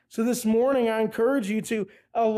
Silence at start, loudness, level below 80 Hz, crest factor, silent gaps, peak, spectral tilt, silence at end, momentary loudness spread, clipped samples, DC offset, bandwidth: 0.15 s; -25 LUFS; -66 dBFS; 10 dB; none; -14 dBFS; -5 dB/octave; 0 s; 8 LU; under 0.1%; under 0.1%; 16 kHz